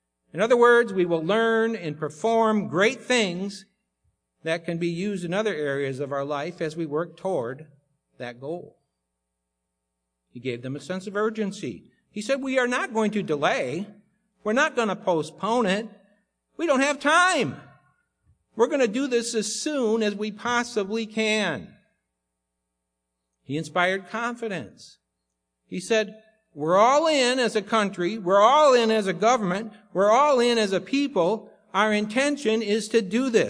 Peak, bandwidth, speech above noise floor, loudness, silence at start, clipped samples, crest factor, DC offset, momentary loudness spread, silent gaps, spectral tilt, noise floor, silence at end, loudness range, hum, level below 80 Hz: -6 dBFS; 10.5 kHz; 57 dB; -24 LUFS; 0.35 s; under 0.1%; 20 dB; under 0.1%; 15 LU; none; -4 dB/octave; -81 dBFS; 0 s; 11 LU; none; -72 dBFS